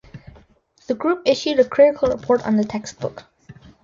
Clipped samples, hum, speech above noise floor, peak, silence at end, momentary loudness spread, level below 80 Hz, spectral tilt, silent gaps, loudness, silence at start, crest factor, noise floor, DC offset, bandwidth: under 0.1%; none; 36 dB; -2 dBFS; 0.3 s; 14 LU; -52 dBFS; -5.5 dB/octave; none; -19 LUFS; 0.15 s; 18 dB; -55 dBFS; under 0.1%; 7.6 kHz